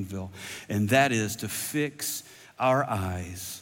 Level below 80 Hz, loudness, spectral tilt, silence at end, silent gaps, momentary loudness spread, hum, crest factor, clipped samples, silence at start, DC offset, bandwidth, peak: -66 dBFS; -28 LUFS; -4.5 dB/octave; 0 s; none; 14 LU; none; 18 dB; under 0.1%; 0 s; under 0.1%; 17 kHz; -10 dBFS